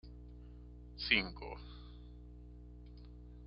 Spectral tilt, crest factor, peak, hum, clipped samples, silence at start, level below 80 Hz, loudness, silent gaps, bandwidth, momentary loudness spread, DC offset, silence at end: -1.5 dB/octave; 30 dB; -14 dBFS; 60 Hz at -50 dBFS; under 0.1%; 0.05 s; -54 dBFS; -36 LUFS; none; 5.8 kHz; 23 LU; under 0.1%; 0 s